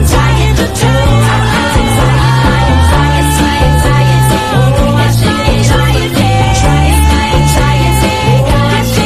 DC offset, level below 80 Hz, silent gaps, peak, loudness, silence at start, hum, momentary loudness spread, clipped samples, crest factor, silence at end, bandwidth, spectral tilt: under 0.1%; -16 dBFS; none; 0 dBFS; -9 LUFS; 0 s; none; 2 LU; 0.2%; 8 dB; 0 s; 15.5 kHz; -5.5 dB/octave